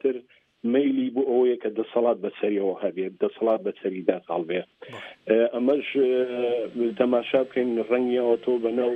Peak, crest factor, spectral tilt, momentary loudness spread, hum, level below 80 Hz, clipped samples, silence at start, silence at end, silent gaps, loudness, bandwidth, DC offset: -6 dBFS; 18 dB; -8 dB/octave; 7 LU; none; -74 dBFS; under 0.1%; 0.05 s; 0 s; none; -25 LUFS; 4.3 kHz; under 0.1%